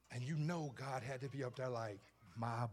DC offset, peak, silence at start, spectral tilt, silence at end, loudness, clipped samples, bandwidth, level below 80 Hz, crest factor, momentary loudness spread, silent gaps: under 0.1%; -30 dBFS; 0.1 s; -6.5 dB/octave; 0 s; -44 LUFS; under 0.1%; 13.5 kHz; -78 dBFS; 14 dB; 7 LU; none